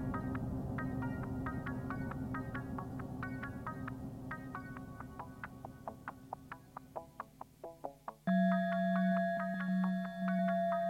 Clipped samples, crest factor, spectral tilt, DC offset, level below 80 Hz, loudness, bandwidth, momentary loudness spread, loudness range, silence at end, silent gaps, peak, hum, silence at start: under 0.1%; 16 dB; -8.5 dB/octave; under 0.1%; -56 dBFS; -39 LUFS; 13.5 kHz; 16 LU; 13 LU; 0 s; none; -22 dBFS; none; 0 s